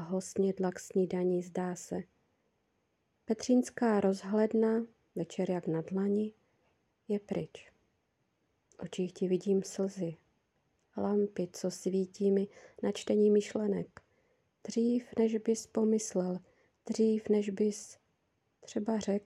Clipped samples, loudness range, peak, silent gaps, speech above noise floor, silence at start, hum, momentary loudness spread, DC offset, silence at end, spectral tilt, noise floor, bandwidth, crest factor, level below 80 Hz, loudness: under 0.1%; 5 LU; -16 dBFS; none; 46 dB; 0 s; none; 12 LU; under 0.1%; 0.05 s; -6.5 dB/octave; -78 dBFS; 12.5 kHz; 16 dB; -78 dBFS; -33 LUFS